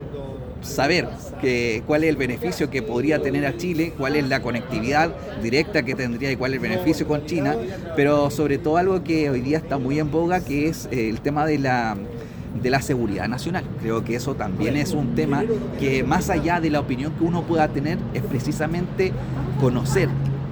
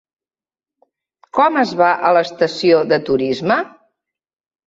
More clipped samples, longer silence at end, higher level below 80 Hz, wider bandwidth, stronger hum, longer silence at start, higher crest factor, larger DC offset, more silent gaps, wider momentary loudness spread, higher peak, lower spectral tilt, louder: neither; second, 0 s vs 1 s; first, -42 dBFS vs -60 dBFS; first, over 20 kHz vs 7.8 kHz; neither; second, 0 s vs 1.35 s; about the same, 18 dB vs 16 dB; neither; neither; about the same, 6 LU vs 6 LU; about the same, -4 dBFS vs -2 dBFS; about the same, -6.5 dB/octave vs -5.5 dB/octave; second, -23 LUFS vs -16 LUFS